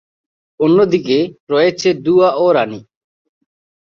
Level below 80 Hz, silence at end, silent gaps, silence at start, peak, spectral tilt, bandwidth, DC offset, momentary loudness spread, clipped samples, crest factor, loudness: -58 dBFS; 1.05 s; 1.40-1.47 s; 0.6 s; -2 dBFS; -6 dB/octave; 7.2 kHz; under 0.1%; 6 LU; under 0.1%; 14 dB; -14 LUFS